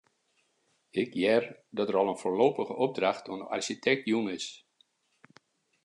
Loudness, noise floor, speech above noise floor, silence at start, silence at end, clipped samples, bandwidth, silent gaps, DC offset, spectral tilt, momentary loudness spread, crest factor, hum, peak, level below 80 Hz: -30 LUFS; -73 dBFS; 44 dB; 0.95 s; 1.3 s; under 0.1%; 11 kHz; none; under 0.1%; -4.5 dB/octave; 10 LU; 20 dB; none; -10 dBFS; -82 dBFS